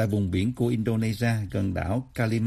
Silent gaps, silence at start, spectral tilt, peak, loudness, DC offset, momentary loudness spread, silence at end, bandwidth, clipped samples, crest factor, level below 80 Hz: none; 0 s; -7.5 dB/octave; -12 dBFS; -27 LUFS; under 0.1%; 3 LU; 0 s; 14.5 kHz; under 0.1%; 14 dB; -48 dBFS